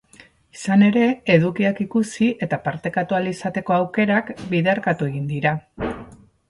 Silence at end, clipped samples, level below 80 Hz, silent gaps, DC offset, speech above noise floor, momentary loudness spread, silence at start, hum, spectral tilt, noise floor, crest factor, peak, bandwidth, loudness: 0.35 s; under 0.1%; -52 dBFS; none; under 0.1%; 31 dB; 10 LU; 0.55 s; none; -7 dB/octave; -51 dBFS; 18 dB; -2 dBFS; 11.5 kHz; -21 LUFS